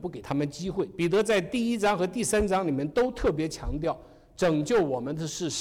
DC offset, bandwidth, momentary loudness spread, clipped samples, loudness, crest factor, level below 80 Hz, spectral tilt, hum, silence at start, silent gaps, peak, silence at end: under 0.1%; 17.5 kHz; 7 LU; under 0.1%; -27 LUFS; 10 dB; -44 dBFS; -5 dB/octave; none; 0 s; none; -18 dBFS; 0 s